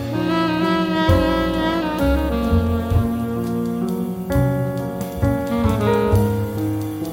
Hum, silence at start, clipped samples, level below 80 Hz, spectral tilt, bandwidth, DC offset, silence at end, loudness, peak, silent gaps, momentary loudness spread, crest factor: none; 0 s; under 0.1%; -32 dBFS; -7 dB/octave; 17 kHz; under 0.1%; 0 s; -20 LUFS; -2 dBFS; none; 6 LU; 16 dB